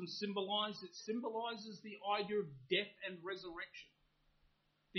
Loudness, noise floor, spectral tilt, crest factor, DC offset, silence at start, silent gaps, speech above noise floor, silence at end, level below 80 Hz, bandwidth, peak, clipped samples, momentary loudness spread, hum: -42 LUFS; -77 dBFS; -2 dB/octave; 22 dB; under 0.1%; 0 s; none; 34 dB; 0 s; -80 dBFS; 6.2 kHz; -20 dBFS; under 0.1%; 11 LU; none